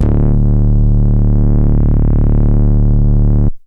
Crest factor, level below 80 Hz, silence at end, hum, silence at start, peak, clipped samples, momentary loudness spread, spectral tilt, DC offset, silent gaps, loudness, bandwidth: 4 dB; -12 dBFS; 0.1 s; none; 0 s; -6 dBFS; under 0.1%; 0 LU; -12.5 dB/octave; under 0.1%; none; -13 LUFS; 1.9 kHz